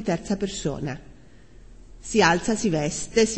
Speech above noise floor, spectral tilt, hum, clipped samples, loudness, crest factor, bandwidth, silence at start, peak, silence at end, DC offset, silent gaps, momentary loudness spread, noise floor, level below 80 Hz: 26 dB; -4 dB/octave; none; under 0.1%; -24 LUFS; 20 dB; 8.8 kHz; 0 s; -6 dBFS; 0 s; 0.3%; none; 14 LU; -50 dBFS; -44 dBFS